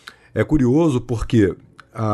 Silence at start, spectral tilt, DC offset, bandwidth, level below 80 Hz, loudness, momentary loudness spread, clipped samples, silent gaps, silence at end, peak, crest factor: 0.35 s; -8 dB/octave; under 0.1%; 12 kHz; -36 dBFS; -19 LUFS; 15 LU; under 0.1%; none; 0 s; -4 dBFS; 14 dB